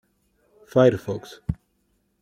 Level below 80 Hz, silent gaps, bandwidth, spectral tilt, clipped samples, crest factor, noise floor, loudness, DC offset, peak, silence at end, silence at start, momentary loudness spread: -48 dBFS; none; 14.5 kHz; -7.5 dB/octave; under 0.1%; 22 dB; -69 dBFS; -23 LUFS; under 0.1%; -4 dBFS; 0.7 s; 0.75 s; 14 LU